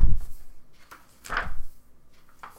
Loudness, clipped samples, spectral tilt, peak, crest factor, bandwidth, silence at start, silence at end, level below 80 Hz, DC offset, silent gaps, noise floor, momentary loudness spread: -33 LUFS; under 0.1%; -5 dB/octave; -4 dBFS; 18 dB; 8 kHz; 0 s; 0.9 s; -30 dBFS; under 0.1%; none; -49 dBFS; 20 LU